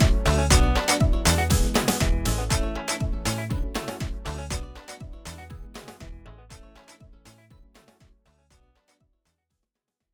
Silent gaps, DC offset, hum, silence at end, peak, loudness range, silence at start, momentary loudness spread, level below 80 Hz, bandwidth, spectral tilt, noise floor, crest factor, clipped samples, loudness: none; under 0.1%; none; 3.1 s; -6 dBFS; 23 LU; 0 s; 22 LU; -28 dBFS; over 20 kHz; -4 dB/octave; -83 dBFS; 20 dB; under 0.1%; -24 LUFS